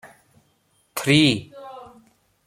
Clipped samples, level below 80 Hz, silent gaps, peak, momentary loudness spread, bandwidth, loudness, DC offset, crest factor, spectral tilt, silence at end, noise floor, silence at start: under 0.1%; -58 dBFS; none; -4 dBFS; 24 LU; 16 kHz; -19 LUFS; under 0.1%; 22 dB; -4.5 dB/octave; 0.6 s; -65 dBFS; 0.05 s